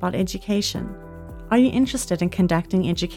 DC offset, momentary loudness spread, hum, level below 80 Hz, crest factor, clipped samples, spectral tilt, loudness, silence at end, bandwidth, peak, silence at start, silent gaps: under 0.1%; 17 LU; none; -42 dBFS; 14 dB; under 0.1%; -5.5 dB/octave; -22 LUFS; 0 s; 16 kHz; -8 dBFS; 0 s; none